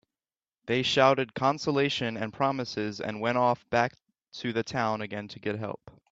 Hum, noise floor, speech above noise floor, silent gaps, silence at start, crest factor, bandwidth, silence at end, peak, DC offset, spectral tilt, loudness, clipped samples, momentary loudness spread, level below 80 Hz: none; under -90 dBFS; over 62 dB; none; 0.65 s; 20 dB; 8 kHz; 0.2 s; -8 dBFS; under 0.1%; -5 dB/octave; -28 LUFS; under 0.1%; 13 LU; -66 dBFS